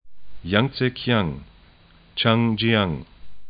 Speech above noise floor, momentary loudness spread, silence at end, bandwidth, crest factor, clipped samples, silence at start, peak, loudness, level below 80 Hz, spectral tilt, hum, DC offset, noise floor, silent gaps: 31 dB; 14 LU; 0 s; 5.2 kHz; 22 dB; under 0.1%; 0.05 s; -2 dBFS; -22 LUFS; -48 dBFS; -11 dB/octave; none; under 0.1%; -52 dBFS; none